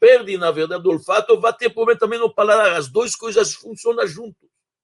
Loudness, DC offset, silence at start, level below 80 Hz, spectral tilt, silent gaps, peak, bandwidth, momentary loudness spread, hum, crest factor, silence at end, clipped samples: -18 LUFS; under 0.1%; 0 s; -66 dBFS; -3 dB/octave; none; -2 dBFS; 11.5 kHz; 8 LU; none; 16 dB; 0.55 s; under 0.1%